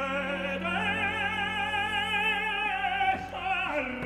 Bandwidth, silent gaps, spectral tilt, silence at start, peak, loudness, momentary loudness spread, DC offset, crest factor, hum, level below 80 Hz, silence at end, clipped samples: 15.5 kHz; none; -4 dB/octave; 0 s; -16 dBFS; -28 LUFS; 4 LU; under 0.1%; 14 dB; none; -54 dBFS; 0 s; under 0.1%